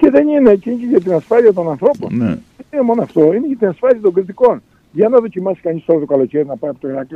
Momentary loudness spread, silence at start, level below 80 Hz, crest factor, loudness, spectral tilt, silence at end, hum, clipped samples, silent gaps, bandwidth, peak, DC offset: 10 LU; 0 s; -52 dBFS; 14 dB; -14 LUFS; -9.5 dB/octave; 0 s; none; under 0.1%; none; 6.2 kHz; 0 dBFS; under 0.1%